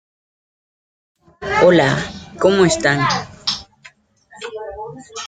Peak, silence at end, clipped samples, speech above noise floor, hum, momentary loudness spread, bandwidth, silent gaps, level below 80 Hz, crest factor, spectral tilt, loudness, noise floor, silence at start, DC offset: 0 dBFS; 0 s; under 0.1%; 34 dB; none; 19 LU; 9.4 kHz; none; -48 dBFS; 18 dB; -4.5 dB/octave; -16 LUFS; -49 dBFS; 1.4 s; under 0.1%